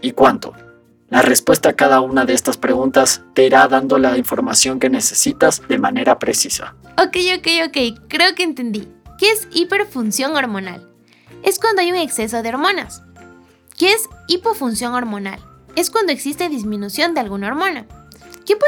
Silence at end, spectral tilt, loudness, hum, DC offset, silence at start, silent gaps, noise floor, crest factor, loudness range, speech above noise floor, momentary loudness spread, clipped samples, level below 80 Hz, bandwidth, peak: 0 s; -2.5 dB/octave; -16 LUFS; none; under 0.1%; 0 s; none; -46 dBFS; 16 dB; 6 LU; 30 dB; 11 LU; under 0.1%; -50 dBFS; over 20 kHz; 0 dBFS